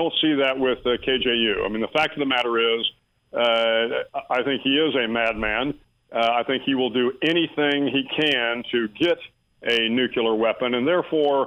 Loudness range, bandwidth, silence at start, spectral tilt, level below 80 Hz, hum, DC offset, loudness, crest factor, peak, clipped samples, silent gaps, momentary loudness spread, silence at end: 1 LU; 10 kHz; 0 s; -5.5 dB/octave; -52 dBFS; none; under 0.1%; -22 LUFS; 14 dB; -8 dBFS; under 0.1%; none; 5 LU; 0 s